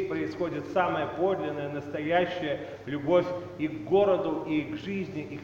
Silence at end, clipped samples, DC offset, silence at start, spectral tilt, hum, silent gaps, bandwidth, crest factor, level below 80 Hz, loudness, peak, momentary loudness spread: 0 s; under 0.1%; under 0.1%; 0 s; -7.5 dB/octave; none; none; 7.4 kHz; 18 dB; -62 dBFS; -29 LUFS; -12 dBFS; 9 LU